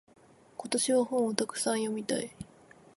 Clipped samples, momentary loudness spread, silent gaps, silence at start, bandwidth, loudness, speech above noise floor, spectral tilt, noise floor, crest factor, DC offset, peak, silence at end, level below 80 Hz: under 0.1%; 20 LU; none; 0.6 s; 12 kHz; -30 LUFS; 27 dB; -3 dB/octave; -57 dBFS; 22 dB; under 0.1%; -10 dBFS; 0.5 s; -70 dBFS